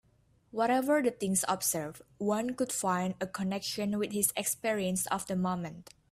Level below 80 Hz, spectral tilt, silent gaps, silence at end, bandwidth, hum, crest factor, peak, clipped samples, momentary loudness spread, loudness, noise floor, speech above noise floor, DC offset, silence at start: -68 dBFS; -4 dB/octave; none; 0.3 s; 16 kHz; none; 20 dB; -12 dBFS; under 0.1%; 8 LU; -31 LUFS; -67 dBFS; 35 dB; under 0.1%; 0.55 s